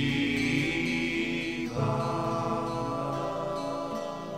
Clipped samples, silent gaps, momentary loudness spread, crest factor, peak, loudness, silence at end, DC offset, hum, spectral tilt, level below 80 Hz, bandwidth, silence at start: under 0.1%; none; 6 LU; 18 dB; -12 dBFS; -30 LUFS; 0 s; 0.2%; none; -5.5 dB/octave; -52 dBFS; 16 kHz; 0 s